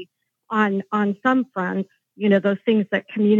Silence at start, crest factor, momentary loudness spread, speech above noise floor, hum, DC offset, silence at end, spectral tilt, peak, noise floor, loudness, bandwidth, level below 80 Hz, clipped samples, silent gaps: 0 s; 18 dB; 7 LU; 26 dB; none; under 0.1%; 0 s; -8 dB/octave; -4 dBFS; -46 dBFS; -21 LUFS; 7 kHz; -88 dBFS; under 0.1%; none